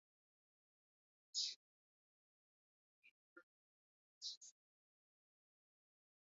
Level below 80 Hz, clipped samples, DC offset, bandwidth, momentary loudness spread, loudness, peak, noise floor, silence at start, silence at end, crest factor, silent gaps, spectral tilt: under -90 dBFS; under 0.1%; under 0.1%; 7.4 kHz; 19 LU; -47 LUFS; -30 dBFS; under -90 dBFS; 1.35 s; 1.9 s; 28 dB; 1.56-3.02 s, 3.11-3.36 s, 3.43-4.21 s, 4.37-4.41 s; 5.5 dB/octave